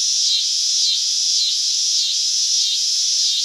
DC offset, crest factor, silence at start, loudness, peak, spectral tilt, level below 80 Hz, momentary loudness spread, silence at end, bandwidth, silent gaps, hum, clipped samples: under 0.1%; 14 dB; 0 s; -15 LUFS; -4 dBFS; 13 dB/octave; under -90 dBFS; 1 LU; 0 s; 16 kHz; none; none; under 0.1%